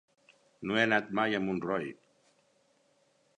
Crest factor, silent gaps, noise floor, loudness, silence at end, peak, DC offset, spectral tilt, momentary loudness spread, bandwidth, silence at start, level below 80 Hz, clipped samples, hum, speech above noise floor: 24 dB; none; -70 dBFS; -31 LUFS; 1.45 s; -12 dBFS; under 0.1%; -5.5 dB/octave; 12 LU; 10 kHz; 0.6 s; -70 dBFS; under 0.1%; none; 40 dB